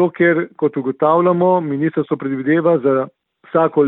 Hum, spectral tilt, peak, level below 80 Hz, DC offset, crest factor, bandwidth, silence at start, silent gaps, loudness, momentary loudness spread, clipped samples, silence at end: none; -12.5 dB/octave; -2 dBFS; -64 dBFS; under 0.1%; 14 dB; 4 kHz; 0 s; none; -16 LUFS; 7 LU; under 0.1%; 0 s